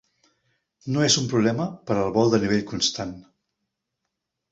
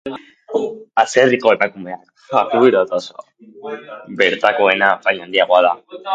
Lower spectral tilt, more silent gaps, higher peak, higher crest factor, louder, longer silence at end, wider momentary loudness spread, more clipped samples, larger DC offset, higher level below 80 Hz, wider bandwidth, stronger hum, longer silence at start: about the same, -4 dB/octave vs -4 dB/octave; neither; second, -6 dBFS vs 0 dBFS; about the same, 20 dB vs 16 dB; second, -22 LUFS vs -15 LUFS; first, 1.3 s vs 0 s; second, 11 LU vs 18 LU; neither; neither; first, -56 dBFS vs -64 dBFS; second, 8.2 kHz vs 9.2 kHz; neither; first, 0.85 s vs 0.05 s